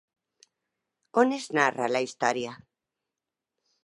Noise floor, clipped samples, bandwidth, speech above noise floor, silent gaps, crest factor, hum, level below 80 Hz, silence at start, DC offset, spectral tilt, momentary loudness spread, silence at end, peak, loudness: -88 dBFS; under 0.1%; 11.5 kHz; 62 dB; none; 24 dB; none; -78 dBFS; 1.15 s; under 0.1%; -4 dB/octave; 7 LU; 1.3 s; -6 dBFS; -26 LUFS